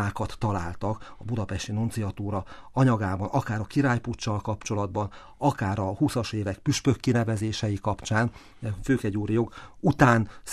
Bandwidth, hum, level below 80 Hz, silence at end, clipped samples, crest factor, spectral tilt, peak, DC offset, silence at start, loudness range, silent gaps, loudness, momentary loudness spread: 13 kHz; none; -48 dBFS; 0 s; under 0.1%; 22 dB; -6 dB/octave; -4 dBFS; under 0.1%; 0 s; 2 LU; none; -27 LUFS; 9 LU